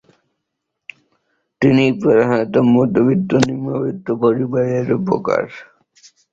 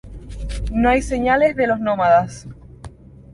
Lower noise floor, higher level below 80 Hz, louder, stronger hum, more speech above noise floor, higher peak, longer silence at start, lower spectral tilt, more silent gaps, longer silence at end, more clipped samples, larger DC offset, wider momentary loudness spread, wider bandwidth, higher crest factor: first, -77 dBFS vs -40 dBFS; second, -54 dBFS vs -32 dBFS; about the same, -16 LUFS vs -18 LUFS; neither; first, 62 dB vs 23 dB; about the same, 0 dBFS vs -2 dBFS; first, 1.6 s vs 0.05 s; first, -7.5 dB/octave vs -6 dB/octave; neither; first, 0.7 s vs 0.45 s; neither; neither; second, 8 LU vs 20 LU; second, 7.8 kHz vs 11.5 kHz; about the same, 18 dB vs 16 dB